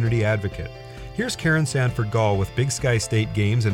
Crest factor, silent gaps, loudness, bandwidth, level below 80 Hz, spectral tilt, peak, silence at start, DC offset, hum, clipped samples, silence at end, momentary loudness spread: 12 dB; none; -22 LUFS; 15.5 kHz; -42 dBFS; -5.5 dB/octave; -10 dBFS; 0 s; under 0.1%; none; under 0.1%; 0 s; 12 LU